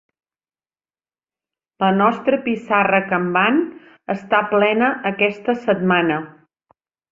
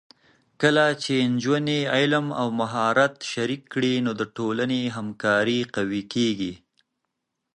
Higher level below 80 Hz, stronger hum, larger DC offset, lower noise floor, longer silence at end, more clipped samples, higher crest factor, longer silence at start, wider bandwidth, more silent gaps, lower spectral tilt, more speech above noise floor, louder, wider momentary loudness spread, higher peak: about the same, -62 dBFS vs -64 dBFS; neither; neither; first, under -90 dBFS vs -80 dBFS; second, 0.8 s vs 1 s; neither; about the same, 18 dB vs 20 dB; first, 1.8 s vs 0.6 s; second, 7.4 kHz vs 10.5 kHz; neither; first, -7.5 dB/octave vs -5 dB/octave; first, over 72 dB vs 57 dB; first, -18 LUFS vs -24 LUFS; first, 10 LU vs 7 LU; about the same, -2 dBFS vs -4 dBFS